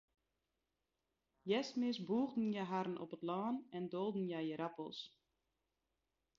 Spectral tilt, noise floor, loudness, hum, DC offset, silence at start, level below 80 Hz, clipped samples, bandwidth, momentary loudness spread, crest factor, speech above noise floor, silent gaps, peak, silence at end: -5 dB/octave; -89 dBFS; -42 LUFS; none; under 0.1%; 1.45 s; -86 dBFS; under 0.1%; 7.2 kHz; 10 LU; 18 dB; 48 dB; none; -26 dBFS; 1.3 s